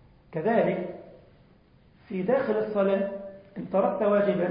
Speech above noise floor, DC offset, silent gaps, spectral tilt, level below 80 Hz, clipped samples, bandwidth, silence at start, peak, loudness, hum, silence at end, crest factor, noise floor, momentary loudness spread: 33 dB; under 0.1%; none; -11.5 dB/octave; -64 dBFS; under 0.1%; 5.2 kHz; 0.3 s; -10 dBFS; -26 LUFS; none; 0 s; 16 dB; -58 dBFS; 16 LU